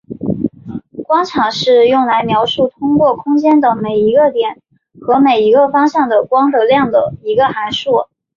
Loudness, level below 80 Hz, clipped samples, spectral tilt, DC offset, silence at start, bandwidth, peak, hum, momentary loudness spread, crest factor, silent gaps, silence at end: -12 LUFS; -50 dBFS; under 0.1%; -6 dB/octave; under 0.1%; 0.1 s; 7.4 kHz; -2 dBFS; none; 9 LU; 12 dB; none; 0.3 s